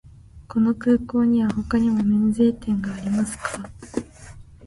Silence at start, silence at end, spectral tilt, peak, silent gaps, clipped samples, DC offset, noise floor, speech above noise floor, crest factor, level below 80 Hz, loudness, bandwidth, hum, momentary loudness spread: 0.05 s; 0 s; -7 dB/octave; -8 dBFS; none; under 0.1%; under 0.1%; -43 dBFS; 22 dB; 14 dB; -46 dBFS; -22 LUFS; 11.5 kHz; none; 13 LU